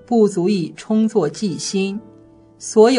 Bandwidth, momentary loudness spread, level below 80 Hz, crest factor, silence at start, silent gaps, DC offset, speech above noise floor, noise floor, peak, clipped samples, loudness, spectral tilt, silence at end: 11 kHz; 9 LU; -62 dBFS; 16 dB; 0.1 s; none; under 0.1%; 30 dB; -46 dBFS; -2 dBFS; under 0.1%; -19 LUFS; -5.5 dB/octave; 0 s